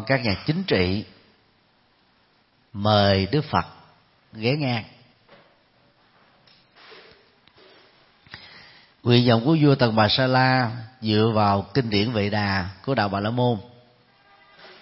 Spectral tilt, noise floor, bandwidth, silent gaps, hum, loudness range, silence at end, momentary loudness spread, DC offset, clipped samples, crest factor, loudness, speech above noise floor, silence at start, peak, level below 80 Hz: -10 dB/octave; -62 dBFS; 5.8 kHz; none; none; 12 LU; 0.15 s; 12 LU; under 0.1%; under 0.1%; 20 dB; -22 LUFS; 41 dB; 0 s; -4 dBFS; -56 dBFS